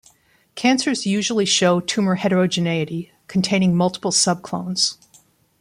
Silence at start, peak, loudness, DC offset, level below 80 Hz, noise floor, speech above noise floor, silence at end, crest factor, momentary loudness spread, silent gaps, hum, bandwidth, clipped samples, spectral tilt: 0.55 s; -4 dBFS; -19 LUFS; under 0.1%; -62 dBFS; -57 dBFS; 38 dB; 0.65 s; 16 dB; 9 LU; none; none; 11.5 kHz; under 0.1%; -4 dB/octave